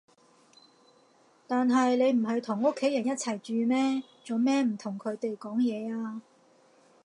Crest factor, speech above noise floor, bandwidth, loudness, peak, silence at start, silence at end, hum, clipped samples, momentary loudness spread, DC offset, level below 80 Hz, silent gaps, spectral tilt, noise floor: 16 dB; 35 dB; 11 kHz; -29 LUFS; -14 dBFS; 1.5 s; 0.85 s; none; under 0.1%; 10 LU; under 0.1%; -86 dBFS; none; -5 dB/octave; -63 dBFS